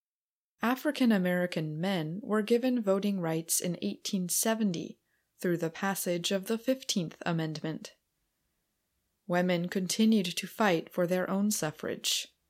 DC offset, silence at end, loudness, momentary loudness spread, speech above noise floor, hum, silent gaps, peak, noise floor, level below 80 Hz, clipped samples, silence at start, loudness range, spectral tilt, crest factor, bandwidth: under 0.1%; 0.25 s; -30 LUFS; 7 LU; over 60 dB; none; none; -14 dBFS; under -90 dBFS; -80 dBFS; under 0.1%; 0.6 s; 5 LU; -4.5 dB/octave; 18 dB; 16.5 kHz